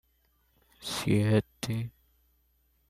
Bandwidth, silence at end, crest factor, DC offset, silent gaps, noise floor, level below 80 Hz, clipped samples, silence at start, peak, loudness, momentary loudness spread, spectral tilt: 15 kHz; 1 s; 20 dB; under 0.1%; none; -70 dBFS; -58 dBFS; under 0.1%; 0.8 s; -14 dBFS; -30 LUFS; 15 LU; -6 dB/octave